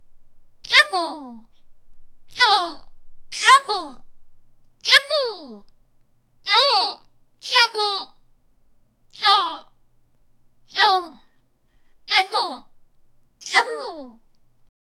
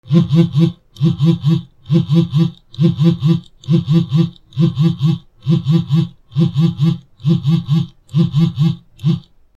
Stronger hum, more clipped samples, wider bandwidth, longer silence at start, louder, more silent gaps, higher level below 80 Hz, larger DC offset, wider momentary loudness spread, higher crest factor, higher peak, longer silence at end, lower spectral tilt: neither; neither; first, 16.5 kHz vs 7.2 kHz; about the same, 0.1 s vs 0.05 s; second, -19 LUFS vs -16 LUFS; neither; second, -56 dBFS vs -50 dBFS; neither; first, 23 LU vs 6 LU; first, 24 dB vs 14 dB; about the same, 0 dBFS vs 0 dBFS; first, 0.9 s vs 0.4 s; second, 0.5 dB/octave vs -9 dB/octave